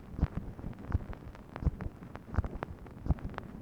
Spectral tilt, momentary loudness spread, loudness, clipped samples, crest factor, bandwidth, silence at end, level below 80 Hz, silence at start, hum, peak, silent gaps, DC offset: -9 dB/octave; 10 LU; -39 LUFS; under 0.1%; 22 dB; 6.6 kHz; 0 s; -40 dBFS; 0 s; none; -14 dBFS; none; under 0.1%